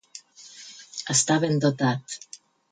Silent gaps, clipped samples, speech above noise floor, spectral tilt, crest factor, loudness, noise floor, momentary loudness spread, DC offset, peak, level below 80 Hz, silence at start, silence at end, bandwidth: none; under 0.1%; 24 dB; -4 dB/octave; 18 dB; -23 LUFS; -47 dBFS; 23 LU; under 0.1%; -8 dBFS; -70 dBFS; 0.15 s; 0.35 s; 9.6 kHz